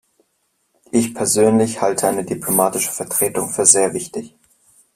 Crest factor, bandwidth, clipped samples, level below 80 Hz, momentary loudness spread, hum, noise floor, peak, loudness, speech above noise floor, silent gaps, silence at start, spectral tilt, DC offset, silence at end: 20 dB; 16 kHz; under 0.1%; -58 dBFS; 10 LU; none; -67 dBFS; 0 dBFS; -16 LUFS; 50 dB; none; 0.95 s; -3.5 dB/octave; under 0.1%; 0.7 s